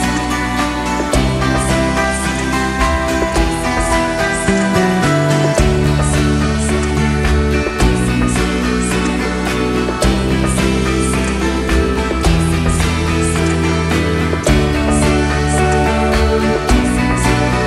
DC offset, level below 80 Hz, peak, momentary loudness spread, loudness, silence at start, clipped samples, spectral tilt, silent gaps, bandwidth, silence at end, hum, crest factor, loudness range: under 0.1%; -22 dBFS; 0 dBFS; 3 LU; -15 LUFS; 0 s; under 0.1%; -5 dB/octave; none; 14.5 kHz; 0 s; none; 14 dB; 2 LU